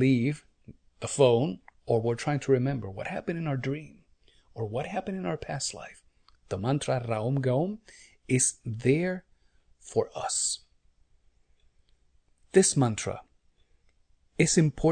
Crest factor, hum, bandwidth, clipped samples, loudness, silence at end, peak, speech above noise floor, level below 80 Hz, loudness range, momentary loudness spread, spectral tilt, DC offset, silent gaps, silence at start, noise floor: 20 dB; none; 9.4 kHz; under 0.1%; -28 LUFS; 0 s; -8 dBFS; 38 dB; -56 dBFS; 6 LU; 15 LU; -5 dB/octave; under 0.1%; none; 0 s; -65 dBFS